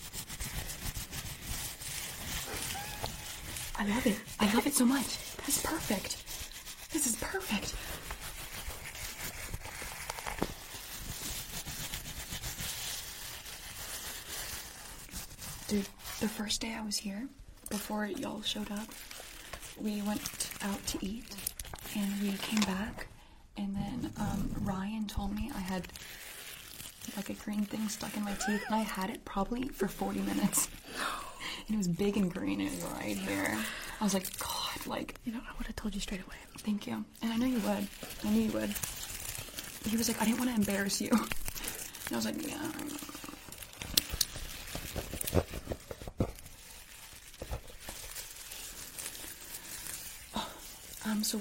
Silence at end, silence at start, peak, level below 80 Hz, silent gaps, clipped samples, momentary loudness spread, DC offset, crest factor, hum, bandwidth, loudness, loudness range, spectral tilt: 0 s; 0 s; -4 dBFS; -50 dBFS; none; under 0.1%; 12 LU; under 0.1%; 32 dB; none; 16.5 kHz; -36 LUFS; 7 LU; -3.5 dB/octave